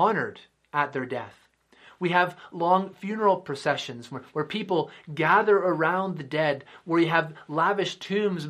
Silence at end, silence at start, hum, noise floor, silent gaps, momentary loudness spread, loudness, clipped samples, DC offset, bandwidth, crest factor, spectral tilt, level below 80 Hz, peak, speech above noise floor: 0 s; 0 s; none; -56 dBFS; none; 12 LU; -26 LUFS; under 0.1%; under 0.1%; 12.5 kHz; 20 dB; -6 dB/octave; -74 dBFS; -6 dBFS; 30 dB